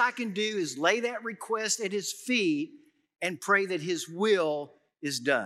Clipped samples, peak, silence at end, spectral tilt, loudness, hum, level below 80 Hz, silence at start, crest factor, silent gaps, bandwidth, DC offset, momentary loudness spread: under 0.1%; -10 dBFS; 0 s; -3 dB/octave; -29 LUFS; none; under -90 dBFS; 0 s; 20 dB; none; 14.5 kHz; under 0.1%; 9 LU